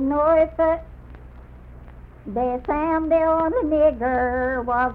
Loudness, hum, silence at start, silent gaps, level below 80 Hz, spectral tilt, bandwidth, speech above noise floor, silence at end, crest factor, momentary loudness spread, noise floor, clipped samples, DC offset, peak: -21 LUFS; none; 0 s; none; -40 dBFS; -9.5 dB/octave; 4.4 kHz; 22 dB; 0 s; 14 dB; 7 LU; -42 dBFS; under 0.1%; under 0.1%; -8 dBFS